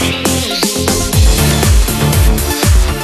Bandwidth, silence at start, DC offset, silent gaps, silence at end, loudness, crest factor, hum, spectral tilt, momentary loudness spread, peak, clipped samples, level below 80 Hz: 13.5 kHz; 0 s; under 0.1%; none; 0 s; -12 LUFS; 10 dB; none; -4 dB/octave; 3 LU; 0 dBFS; under 0.1%; -14 dBFS